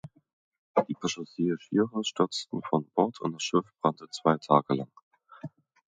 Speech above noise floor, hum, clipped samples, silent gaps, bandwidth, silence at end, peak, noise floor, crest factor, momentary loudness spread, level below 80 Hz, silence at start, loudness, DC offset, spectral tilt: 17 dB; none; under 0.1%; 0.33-0.52 s, 0.58-0.75 s, 5.03-5.11 s; 9.4 kHz; 0.5 s; -4 dBFS; -46 dBFS; 26 dB; 11 LU; -74 dBFS; 0.05 s; -29 LUFS; under 0.1%; -5.5 dB/octave